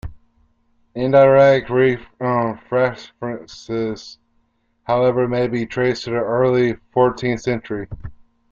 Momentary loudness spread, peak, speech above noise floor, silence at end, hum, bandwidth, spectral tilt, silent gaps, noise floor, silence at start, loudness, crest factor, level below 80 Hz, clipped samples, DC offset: 19 LU; -2 dBFS; 46 dB; 0.4 s; none; 7.4 kHz; -7 dB/octave; none; -63 dBFS; 0.05 s; -18 LUFS; 16 dB; -46 dBFS; under 0.1%; under 0.1%